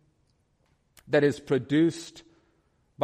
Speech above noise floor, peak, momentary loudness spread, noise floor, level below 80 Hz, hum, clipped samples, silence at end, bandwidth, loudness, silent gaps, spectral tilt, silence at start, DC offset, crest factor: 44 dB; -10 dBFS; 15 LU; -69 dBFS; -66 dBFS; none; under 0.1%; 0 s; 13 kHz; -25 LUFS; none; -6.5 dB/octave; 1.1 s; under 0.1%; 18 dB